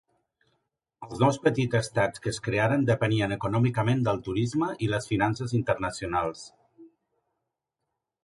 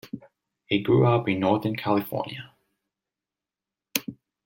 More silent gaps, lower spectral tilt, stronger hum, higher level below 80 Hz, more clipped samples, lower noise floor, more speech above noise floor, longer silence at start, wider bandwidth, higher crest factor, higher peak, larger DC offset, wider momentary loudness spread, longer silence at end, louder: neither; about the same, -6.5 dB/octave vs -6 dB/octave; neither; first, -54 dBFS vs -64 dBFS; neither; second, -84 dBFS vs -90 dBFS; second, 58 dB vs 66 dB; first, 1 s vs 0.05 s; second, 11.5 kHz vs 16.5 kHz; about the same, 20 dB vs 24 dB; second, -8 dBFS vs -4 dBFS; neither; second, 5 LU vs 21 LU; first, 1.35 s vs 0.35 s; about the same, -27 LUFS vs -25 LUFS